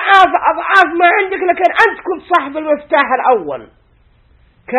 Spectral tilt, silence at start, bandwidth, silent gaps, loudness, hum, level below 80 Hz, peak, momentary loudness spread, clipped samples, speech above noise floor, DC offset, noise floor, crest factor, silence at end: -3.5 dB/octave; 0 s; 10.5 kHz; none; -12 LUFS; none; -52 dBFS; 0 dBFS; 9 LU; 0.3%; 38 dB; under 0.1%; -51 dBFS; 14 dB; 0 s